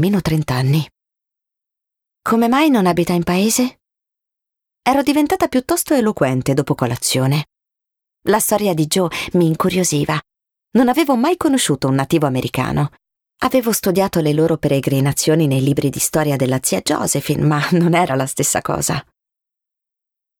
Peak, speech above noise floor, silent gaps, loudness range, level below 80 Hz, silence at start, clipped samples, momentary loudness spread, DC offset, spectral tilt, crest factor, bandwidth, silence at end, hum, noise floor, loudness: -4 dBFS; 69 dB; none; 2 LU; -48 dBFS; 0 s; under 0.1%; 5 LU; under 0.1%; -5 dB/octave; 14 dB; 19.5 kHz; 1.35 s; none; -84 dBFS; -17 LUFS